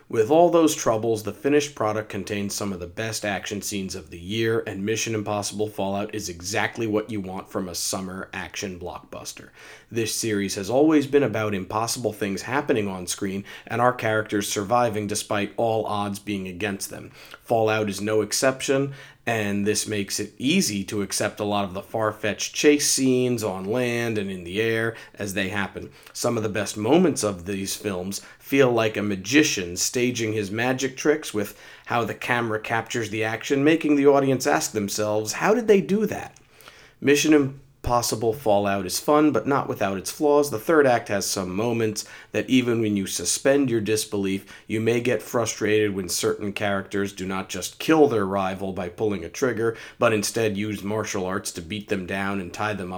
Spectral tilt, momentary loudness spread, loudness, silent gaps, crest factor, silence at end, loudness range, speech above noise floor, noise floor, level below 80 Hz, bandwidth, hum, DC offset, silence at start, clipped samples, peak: -4 dB/octave; 11 LU; -24 LUFS; none; 22 dB; 0 s; 5 LU; 26 dB; -49 dBFS; -56 dBFS; over 20 kHz; none; under 0.1%; 0.1 s; under 0.1%; -2 dBFS